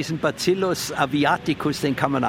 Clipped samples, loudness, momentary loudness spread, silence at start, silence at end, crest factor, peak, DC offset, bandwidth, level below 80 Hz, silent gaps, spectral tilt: under 0.1%; -22 LUFS; 3 LU; 0 s; 0 s; 20 dB; -2 dBFS; under 0.1%; 16.5 kHz; -54 dBFS; none; -5 dB/octave